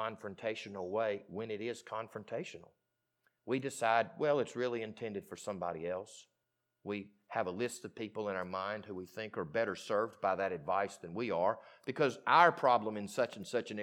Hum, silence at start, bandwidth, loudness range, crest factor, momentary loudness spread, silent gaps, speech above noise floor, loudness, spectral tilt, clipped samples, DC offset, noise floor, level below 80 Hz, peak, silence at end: none; 0 s; 17.5 kHz; 9 LU; 26 dB; 12 LU; none; 50 dB; -36 LUFS; -5 dB/octave; under 0.1%; under 0.1%; -85 dBFS; -80 dBFS; -12 dBFS; 0 s